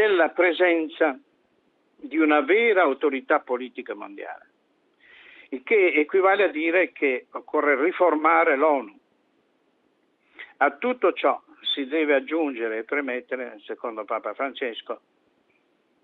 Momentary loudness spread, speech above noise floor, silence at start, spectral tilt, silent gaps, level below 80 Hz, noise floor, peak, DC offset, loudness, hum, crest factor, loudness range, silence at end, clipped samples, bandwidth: 17 LU; 44 dB; 0 s; -5.5 dB/octave; none; -80 dBFS; -67 dBFS; -6 dBFS; under 0.1%; -23 LUFS; none; 18 dB; 6 LU; 1.1 s; under 0.1%; 4.4 kHz